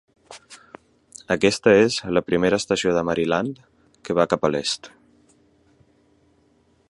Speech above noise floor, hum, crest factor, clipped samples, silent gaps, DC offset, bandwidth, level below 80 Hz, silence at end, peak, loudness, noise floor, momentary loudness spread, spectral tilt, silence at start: 41 dB; none; 22 dB; under 0.1%; none; under 0.1%; 11.5 kHz; -54 dBFS; 2 s; -2 dBFS; -21 LUFS; -61 dBFS; 17 LU; -4.5 dB/octave; 0.3 s